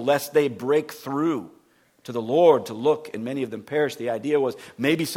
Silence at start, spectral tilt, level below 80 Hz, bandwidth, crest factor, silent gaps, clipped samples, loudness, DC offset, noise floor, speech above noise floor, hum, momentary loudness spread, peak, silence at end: 0 s; -5.5 dB/octave; -72 dBFS; 17 kHz; 18 dB; none; under 0.1%; -24 LUFS; under 0.1%; -60 dBFS; 37 dB; none; 12 LU; -4 dBFS; 0 s